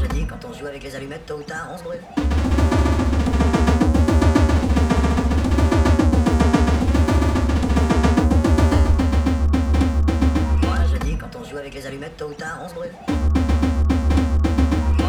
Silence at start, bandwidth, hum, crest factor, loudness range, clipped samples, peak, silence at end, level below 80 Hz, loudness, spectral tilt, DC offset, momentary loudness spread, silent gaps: 0 s; 11 kHz; none; 14 dB; 6 LU; under 0.1%; -2 dBFS; 0 s; -20 dBFS; -19 LUFS; -7 dB/octave; 0.7%; 15 LU; none